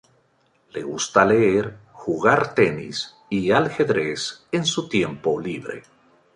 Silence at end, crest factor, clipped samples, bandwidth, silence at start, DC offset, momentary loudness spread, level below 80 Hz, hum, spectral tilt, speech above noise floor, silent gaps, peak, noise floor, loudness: 0.55 s; 20 dB; under 0.1%; 11 kHz; 0.75 s; under 0.1%; 15 LU; -58 dBFS; none; -4.5 dB/octave; 42 dB; none; -2 dBFS; -63 dBFS; -21 LUFS